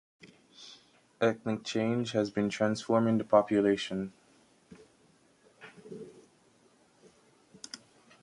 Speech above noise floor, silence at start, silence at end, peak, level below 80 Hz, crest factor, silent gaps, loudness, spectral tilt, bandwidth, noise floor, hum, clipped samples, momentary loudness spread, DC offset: 36 dB; 0.25 s; 0.45 s; -10 dBFS; -70 dBFS; 24 dB; none; -30 LUFS; -6 dB/octave; 11.5 kHz; -65 dBFS; none; under 0.1%; 24 LU; under 0.1%